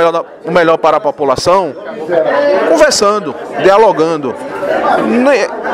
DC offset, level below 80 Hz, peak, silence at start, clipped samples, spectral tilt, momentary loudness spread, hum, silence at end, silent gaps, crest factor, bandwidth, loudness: under 0.1%; -46 dBFS; 0 dBFS; 0 s; 0.3%; -4 dB/octave; 10 LU; none; 0 s; none; 10 dB; 15 kHz; -11 LUFS